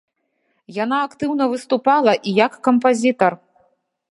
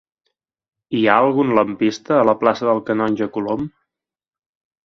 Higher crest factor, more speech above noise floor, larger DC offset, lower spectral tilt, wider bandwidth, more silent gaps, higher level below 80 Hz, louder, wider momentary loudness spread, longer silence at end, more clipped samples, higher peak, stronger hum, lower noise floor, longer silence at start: about the same, 18 dB vs 20 dB; second, 52 dB vs 59 dB; neither; second, -5 dB/octave vs -6.5 dB/octave; first, 11.5 kHz vs 7 kHz; neither; second, -68 dBFS vs -58 dBFS; about the same, -18 LUFS vs -18 LUFS; about the same, 7 LU vs 9 LU; second, 0.8 s vs 1.2 s; neither; about the same, 0 dBFS vs 0 dBFS; neither; second, -69 dBFS vs -76 dBFS; second, 0.7 s vs 0.9 s